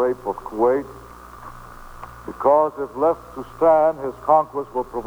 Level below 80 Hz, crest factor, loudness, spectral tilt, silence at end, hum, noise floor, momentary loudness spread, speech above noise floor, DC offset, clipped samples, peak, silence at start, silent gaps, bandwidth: -48 dBFS; 18 dB; -20 LUFS; -7.5 dB/octave; 0 s; none; -39 dBFS; 22 LU; 19 dB; under 0.1%; under 0.1%; -4 dBFS; 0 s; none; over 20 kHz